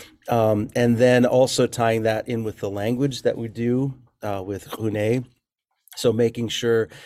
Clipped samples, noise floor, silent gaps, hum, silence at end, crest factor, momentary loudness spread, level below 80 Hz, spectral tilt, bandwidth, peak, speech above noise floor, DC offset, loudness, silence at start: under 0.1%; -76 dBFS; none; none; 0 s; 18 dB; 12 LU; -56 dBFS; -5.5 dB/octave; 15.5 kHz; -4 dBFS; 55 dB; under 0.1%; -22 LUFS; 0 s